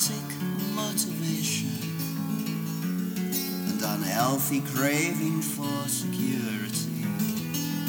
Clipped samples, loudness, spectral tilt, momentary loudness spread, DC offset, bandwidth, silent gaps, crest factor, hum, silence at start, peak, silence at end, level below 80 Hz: under 0.1%; -28 LUFS; -4 dB/octave; 6 LU; under 0.1%; over 20 kHz; none; 18 dB; none; 0 s; -10 dBFS; 0 s; -70 dBFS